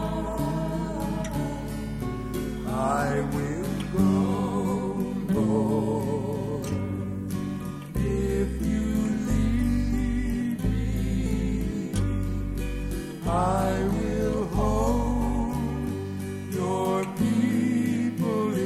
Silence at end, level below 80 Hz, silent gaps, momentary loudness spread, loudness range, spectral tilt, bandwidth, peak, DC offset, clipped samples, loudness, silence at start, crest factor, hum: 0 s; -34 dBFS; none; 7 LU; 3 LU; -7 dB/octave; 15 kHz; -10 dBFS; under 0.1%; under 0.1%; -27 LUFS; 0 s; 16 dB; none